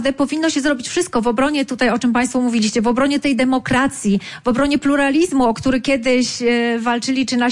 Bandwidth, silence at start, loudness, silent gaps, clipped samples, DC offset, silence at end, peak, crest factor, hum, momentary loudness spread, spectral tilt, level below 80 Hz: 11.5 kHz; 0 s; -17 LUFS; none; under 0.1%; under 0.1%; 0 s; -6 dBFS; 10 dB; none; 3 LU; -4 dB/octave; -44 dBFS